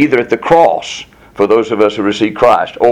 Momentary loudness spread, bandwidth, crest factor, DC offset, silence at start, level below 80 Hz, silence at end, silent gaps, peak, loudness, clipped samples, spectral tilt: 13 LU; 12 kHz; 12 dB; under 0.1%; 0 s; -46 dBFS; 0 s; none; 0 dBFS; -11 LUFS; 0.7%; -5.5 dB/octave